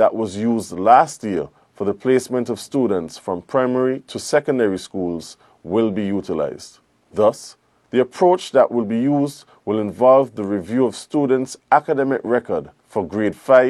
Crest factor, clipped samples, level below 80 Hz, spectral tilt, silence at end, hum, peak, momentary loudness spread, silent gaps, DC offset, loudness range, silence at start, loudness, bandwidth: 18 dB; under 0.1%; -62 dBFS; -6 dB/octave; 0 s; none; 0 dBFS; 12 LU; none; under 0.1%; 4 LU; 0 s; -19 LUFS; 13 kHz